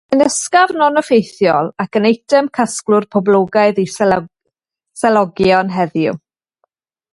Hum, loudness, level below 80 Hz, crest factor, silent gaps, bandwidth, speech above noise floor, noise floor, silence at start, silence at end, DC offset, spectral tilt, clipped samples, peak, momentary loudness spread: none; -14 LUFS; -52 dBFS; 14 dB; none; 11.5 kHz; 60 dB; -74 dBFS; 0.1 s; 0.95 s; under 0.1%; -4.5 dB/octave; under 0.1%; 0 dBFS; 6 LU